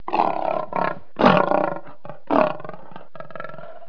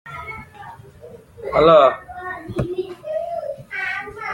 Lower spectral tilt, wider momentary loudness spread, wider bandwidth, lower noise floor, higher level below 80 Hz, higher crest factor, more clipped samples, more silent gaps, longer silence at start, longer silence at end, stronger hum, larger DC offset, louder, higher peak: about the same, -7.5 dB/octave vs -6.5 dB/octave; about the same, 23 LU vs 22 LU; second, 5.4 kHz vs 11.5 kHz; about the same, -42 dBFS vs -42 dBFS; second, -56 dBFS vs -46 dBFS; about the same, 22 dB vs 20 dB; neither; neither; about the same, 0.1 s vs 0.05 s; about the same, 0.05 s vs 0 s; neither; first, 3% vs under 0.1%; about the same, -21 LUFS vs -19 LUFS; about the same, 0 dBFS vs -2 dBFS